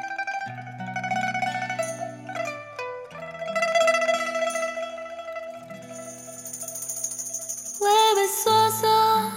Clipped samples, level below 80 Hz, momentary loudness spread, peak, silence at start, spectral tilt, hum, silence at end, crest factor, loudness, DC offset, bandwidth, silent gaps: under 0.1%; -72 dBFS; 17 LU; -8 dBFS; 0 s; -2 dB/octave; none; 0 s; 18 dB; -25 LUFS; under 0.1%; 17 kHz; none